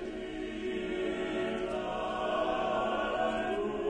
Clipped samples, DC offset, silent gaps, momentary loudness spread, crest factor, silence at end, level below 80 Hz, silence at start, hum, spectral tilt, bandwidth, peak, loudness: under 0.1%; under 0.1%; none; 6 LU; 12 dB; 0 s; -54 dBFS; 0 s; none; -5.5 dB/octave; 10 kHz; -20 dBFS; -33 LUFS